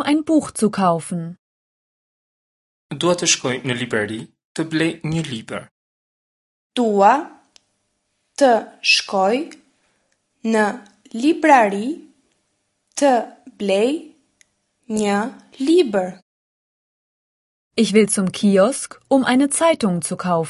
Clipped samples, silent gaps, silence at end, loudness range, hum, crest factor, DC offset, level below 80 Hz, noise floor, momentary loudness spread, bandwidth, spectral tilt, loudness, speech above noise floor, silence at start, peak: under 0.1%; 1.39-2.90 s, 4.44-4.55 s, 5.71-6.70 s, 16.22-17.71 s; 0 s; 5 LU; none; 20 dB; under 0.1%; -62 dBFS; -71 dBFS; 14 LU; 11.5 kHz; -4 dB/octave; -18 LUFS; 53 dB; 0 s; 0 dBFS